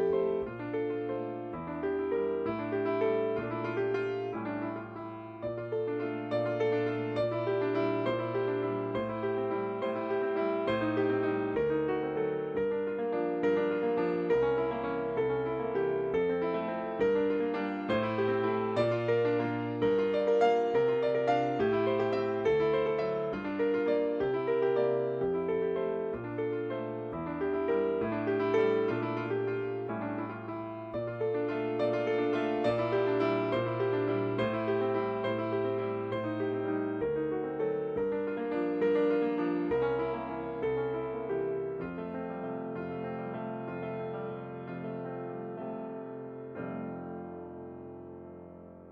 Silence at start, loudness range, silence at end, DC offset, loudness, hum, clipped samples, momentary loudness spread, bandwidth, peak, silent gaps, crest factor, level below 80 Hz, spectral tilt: 0 s; 8 LU; 0 s; under 0.1%; -32 LUFS; none; under 0.1%; 10 LU; 7 kHz; -16 dBFS; none; 16 dB; -64 dBFS; -8.5 dB/octave